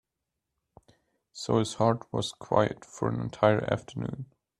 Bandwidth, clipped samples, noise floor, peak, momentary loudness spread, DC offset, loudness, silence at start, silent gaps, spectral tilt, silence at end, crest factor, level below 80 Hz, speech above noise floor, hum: 11 kHz; under 0.1%; -85 dBFS; -6 dBFS; 12 LU; under 0.1%; -29 LUFS; 1.35 s; none; -6 dB/octave; 0.35 s; 24 dB; -60 dBFS; 57 dB; none